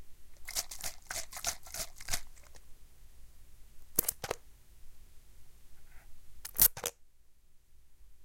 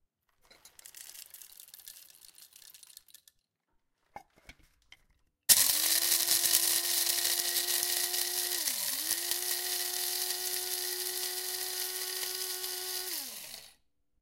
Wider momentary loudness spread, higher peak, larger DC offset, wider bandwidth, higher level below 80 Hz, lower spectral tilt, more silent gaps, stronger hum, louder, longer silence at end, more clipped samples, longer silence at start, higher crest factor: second, 16 LU vs 23 LU; about the same, -6 dBFS vs -6 dBFS; neither; about the same, 17 kHz vs 17 kHz; first, -52 dBFS vs -70 dBFS; first, -0.5 dB/octave vs 2 dB/octave; neither; neither; second, -33 LUFS vs -29 LUFS; second, 0 s vs 0.5 s; neither; second, 0 s vs 0.65 s; about the same, 32 dB vs 28 dB